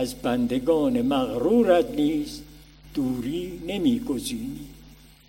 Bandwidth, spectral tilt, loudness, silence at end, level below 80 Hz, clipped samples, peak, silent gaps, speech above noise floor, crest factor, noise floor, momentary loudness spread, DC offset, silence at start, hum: 16.5 kHz; -5.5 dB/octave; -24 LUFS; 0.35 s; -48 dBFS; under 0.1%; -6 dBFS; none; 26 dB; 18 dB; -49 dBFS; 14 LU; under 0.1%; 0 s; none